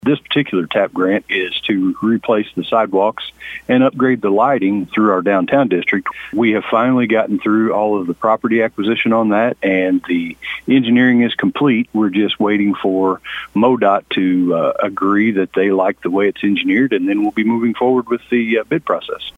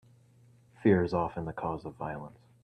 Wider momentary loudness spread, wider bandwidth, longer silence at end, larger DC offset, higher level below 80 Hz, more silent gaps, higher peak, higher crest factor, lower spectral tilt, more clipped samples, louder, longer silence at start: second, 4 LU vs 14 LU; second, 4 kHz vs 9 kHz; second, 0.05 s vs 0.35 s; neither; about the same, -58 dBFS vs -60 dBFS; neither; first, 0 dBFS vs -12 dBFS; second, 14 dB vs 20 dB; second, -7.5 dB/octave vs -9 dB/octave; neither; first, -15 LUFS vs -31 LUFS; second, 0.05 s vs 0.8 s